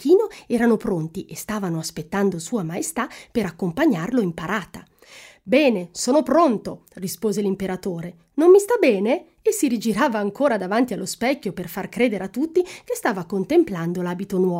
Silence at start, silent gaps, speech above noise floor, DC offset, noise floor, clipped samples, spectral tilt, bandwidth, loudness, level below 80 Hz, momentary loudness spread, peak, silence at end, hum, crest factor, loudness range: 0 s; none; 25 dB; under 0.1%; -47 dBFS; under 0.1%; -5.5 dB/octave; 16 kHz; -22 LUFS; -56 dBFS; 11 LU; -4 dBFS; 0 s; none; 18 dB; 5 LU